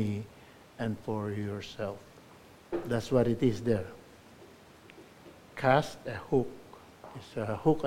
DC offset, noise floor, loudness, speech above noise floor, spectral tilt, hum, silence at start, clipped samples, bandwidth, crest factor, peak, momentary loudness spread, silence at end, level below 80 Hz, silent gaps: under 0.1%; -55 dBFS; -32 LUFS; 24 dB; -7 dB/octave; none; 0 s; under 0.1%; 16.5 kHz; 24 dB; -10 dBFS; 26 LU; 0 s; -58 dBFS; none